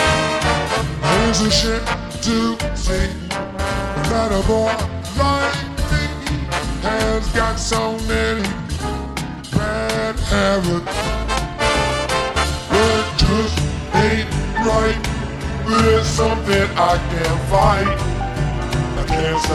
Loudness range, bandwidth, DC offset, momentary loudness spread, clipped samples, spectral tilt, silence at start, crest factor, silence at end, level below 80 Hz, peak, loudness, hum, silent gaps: 3 LU; 13 kHz; under 0.1%; 7 LU; under 0.1%; -4.5 dB/octave; 0 s; 16 dB; 0 s; -26 dBFS; -2 dBFS; -19 LUFS; none; none